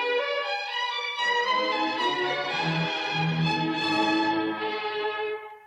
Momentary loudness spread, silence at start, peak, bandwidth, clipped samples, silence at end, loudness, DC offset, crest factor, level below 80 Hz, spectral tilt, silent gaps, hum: 5 LU; 0 s; -14 dBFS; 11.5 kHz; under 0.1%; 0 s; -26 LUFS; under 0.1%; 12 dB; -68 dBFS; -5 dB/octave; none; none